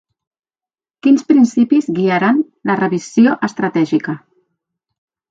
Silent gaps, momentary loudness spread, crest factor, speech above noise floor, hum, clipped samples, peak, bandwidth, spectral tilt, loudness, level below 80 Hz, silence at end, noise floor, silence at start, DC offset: none; 8 LU; 16 dB; over 77 dB; none; under 0.1%; 0 dBFS; 7.8 kHz; -6.5 dB/octave; -14 LUFS; -66 dBFS; 1.15 s; under -90 dBFS; 1.05 s; under 0.1%